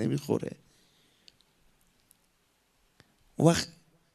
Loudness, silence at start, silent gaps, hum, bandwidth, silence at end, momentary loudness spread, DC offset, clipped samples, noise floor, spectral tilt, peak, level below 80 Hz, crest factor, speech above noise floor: -29 LUFS; 0 s; none; none; 13.5 kHz; 0.45 s; 23 LU; under 0.1%; under 0.1%; -71 dBFS; -5.5 dB/octave; -6 dBFS; -66 dBFS; 28 dB; 43 dB